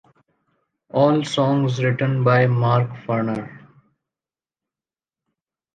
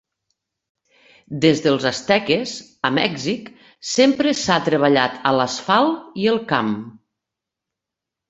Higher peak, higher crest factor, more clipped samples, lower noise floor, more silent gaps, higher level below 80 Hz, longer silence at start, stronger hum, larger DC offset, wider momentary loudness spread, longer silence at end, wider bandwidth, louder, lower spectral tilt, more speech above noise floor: about the same, -4 dBFS vs -2 dBFS; about the same, 18 dB vs 20 dB; neither; first, under -90 dBFS vs -85 dBFS; neither; about the same, -62 dBFS vs -60 dBFS; second, 0.95 s vs 1.3 s; neither; neither; about the same, 10 LU vs 11 LU; first, 2.15 s vs 1.4 s; about the same, 9 kHz vs 8.2 kHz; about the same, -20 LUFS vs -19 LUFS; first, -7.5 dB/octave vs -4.5 dB/octave; first, over 71 dB vs 66 dB